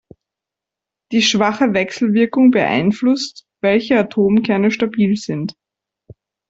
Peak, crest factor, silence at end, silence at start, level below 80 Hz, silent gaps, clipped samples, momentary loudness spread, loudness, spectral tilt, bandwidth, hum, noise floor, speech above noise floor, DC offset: -2 dBFS; 14 dB; 1 s; 1.1 s; -56 dBFS; none; under 0.1%; 8 LU; -16 LUFS; -5 dB/octave; 7.8 kHz; none; -85 dBFS; 70 dB; under 0.1%